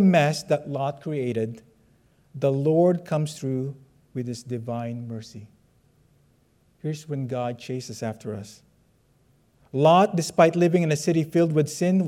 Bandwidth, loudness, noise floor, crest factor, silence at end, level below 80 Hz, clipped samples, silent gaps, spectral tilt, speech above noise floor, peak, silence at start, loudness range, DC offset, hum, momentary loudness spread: 15 kHz; -24 LUFS; -63 dBFS; 20 dB; 0 s; -66 dBFS; under 0.1%; none; -6.5 dB/octave; 40 dB; -4 dBFS; 0 s; 12 LU; under 0.1%; none; 17 LU